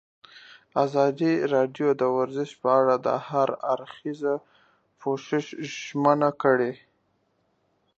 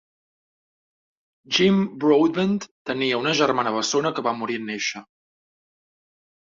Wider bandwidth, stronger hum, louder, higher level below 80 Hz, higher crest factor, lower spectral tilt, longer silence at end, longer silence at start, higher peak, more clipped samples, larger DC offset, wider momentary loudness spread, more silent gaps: about the same, 7.8 kHz vs 7.6 kHz; neither; second, -25 LUFS vs -22 LUFS; second, -76 dBFS vs -66 dBFS; about the same, 20 dB vs 18 dB; first, -6.5 dB/octave vs -4.5 dB/octave; second, 1.2 s vs 1.5 s; second, 0.75 s vs 1.5 s; about the same, -6 dBFS vs -6 dBFS; neither; neither; about the same, 10 LU vs 9 LU; second, none vs 2.71-2.85 s